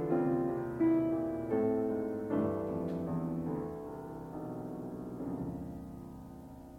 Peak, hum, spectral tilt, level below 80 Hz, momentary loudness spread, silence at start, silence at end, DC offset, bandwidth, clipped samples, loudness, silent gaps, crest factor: -20 dBFS; none; -10 dB/octave; -60 dBFS; 14 LU; 0 s; 0 s; under 0.1%; 15.5 kHz; under 0.1%; -35 LUFS; none; 16 dB